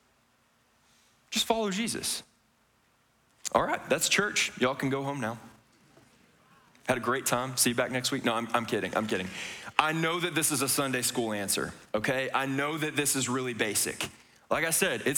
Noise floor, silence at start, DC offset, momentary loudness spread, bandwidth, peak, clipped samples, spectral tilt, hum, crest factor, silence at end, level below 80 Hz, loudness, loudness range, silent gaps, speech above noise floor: -68 dBFS; 1.3 s; under 0.1%; 7 LU; over 20 kHz; -6 dBFS; under 0.1%; -2.5 dB/octave; none; 26 dB; 0 s; -64 dBFS; -29 LUFS; 4 LU; none; 39 dB